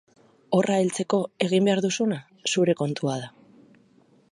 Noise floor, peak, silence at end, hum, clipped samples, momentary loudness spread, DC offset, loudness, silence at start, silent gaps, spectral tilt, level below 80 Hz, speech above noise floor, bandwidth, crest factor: -59 dBFS; -6 dBFS; 1.05 s; none; under 0.1%; 8 LU; under 0.1%; -24 LUFS; 0.5 s; none; -5 dB/octave; -72 dBFS; 36 dB; 11.5 kHz; 20 dB